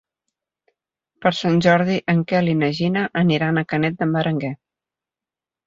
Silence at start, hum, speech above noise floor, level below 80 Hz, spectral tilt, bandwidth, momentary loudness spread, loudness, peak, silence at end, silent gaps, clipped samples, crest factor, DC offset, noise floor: 1.2 s; none; 71 dB; -58 dBFS; -7 dB/octave; 7.6 kHz; 7 LU; -19 LUFS; -2 dBFS; 1.1 s; none; under 0.1%; 20 dB; under 0.1%; -89 dBFS